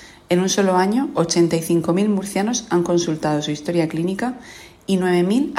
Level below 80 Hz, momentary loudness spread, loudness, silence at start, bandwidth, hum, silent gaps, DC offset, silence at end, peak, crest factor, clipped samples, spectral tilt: -56 dBFS; 6 LU; -19 LUFS; 0 s; 15.5 kHz; none; none; under 0.1%; 0 s; -4 dBFS; 16 dB; under 0.1%; -5 dB/octave